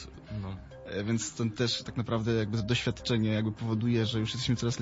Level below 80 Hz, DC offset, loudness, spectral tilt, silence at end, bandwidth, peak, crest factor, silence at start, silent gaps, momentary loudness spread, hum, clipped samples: -52 dBFS; under 0.1%; -31 LUFS; -5.5 dB/octave; 0 s; 8 kHz; -16 dBFS; 16 dB; 0 s; none; 11 LU; none; under 0.1%